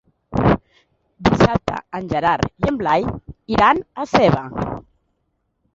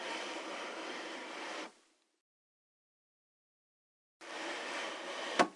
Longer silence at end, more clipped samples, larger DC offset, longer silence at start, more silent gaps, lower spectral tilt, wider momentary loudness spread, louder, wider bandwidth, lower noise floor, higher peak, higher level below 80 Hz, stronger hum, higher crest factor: first, 0.95 s vs 0 s; neither; neither; first, 0.3 s vs 0 s; second, none vs 2.21-4.20 s; first, -7 dB/octave vs -2 dB/octave; first, 12 LU vs 8 LU; first, -19 LUFS vs -41 LUFS; second, 7.8 kHz vs 11.5 kHz; about the same, -70 dBFS vs -70 dBFS; first, 0 dBFS vs -12 dBFS; first, -38 dBFS vs under -90 dBFS; neither; second, 18 dB vs 30 dB